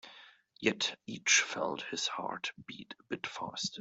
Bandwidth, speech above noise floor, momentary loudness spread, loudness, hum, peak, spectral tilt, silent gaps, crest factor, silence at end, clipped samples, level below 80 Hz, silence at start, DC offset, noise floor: 8.2 kHz; 23 dB; 19 LU; -33 LUFS; none; -12 dBFS; -1 dB/octave; none; 24 dB; 0 s; under 0.1%; -78 dBFS; 0.05 s; under 0.1%; -58 dBFS